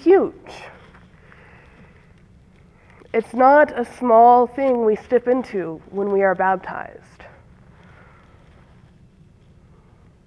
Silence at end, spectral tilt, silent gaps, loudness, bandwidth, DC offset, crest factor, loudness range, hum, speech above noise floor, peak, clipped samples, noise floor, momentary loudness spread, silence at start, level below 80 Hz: 3.4 s; -7.5 dB/octave; none; -17 LUFS; 10.5 kHz; under 0.1%; 18 dB; 11 LU; none; 33 dB; -2 dBFS; under 0.1%; -51 dBFS; 19 LU; 0.05 s; -56 dBFS